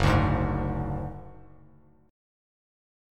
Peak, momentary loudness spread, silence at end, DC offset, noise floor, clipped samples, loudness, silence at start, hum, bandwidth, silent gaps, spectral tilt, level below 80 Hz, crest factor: -8 dBFS; 21 LU; 1.7 s; under 0.1%; -57 dBFS; under 0.1%; -28 LUFS; 0 s; none; 12.5 kHz; none; -7.5 dB/octave; -38 dBFS; 22 dB